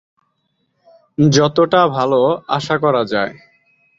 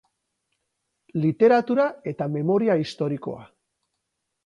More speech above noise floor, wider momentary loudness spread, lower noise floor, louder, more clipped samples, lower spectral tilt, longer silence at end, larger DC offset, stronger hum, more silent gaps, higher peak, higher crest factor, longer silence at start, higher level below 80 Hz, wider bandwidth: second, 53 dB vs 57 dB; second, 8 LU vs 14 LU; second, -67 dBFS vs -79 dBFS; first, -15 LUFS vs -23 LUFS; neither; second, -5.5 dB/octave vs -8 dB/octave; second, 0.65 s vs 1 s; neither; neither; neither; first, -2 dBFS vs -6 dBFS; about the same, 16 dB vs 18 dB; about the same, 1.2 s vs 1.15 s; first, -54 dBFS vs -68 dBFS; second, 7.8 kHz vs 10.5 kHz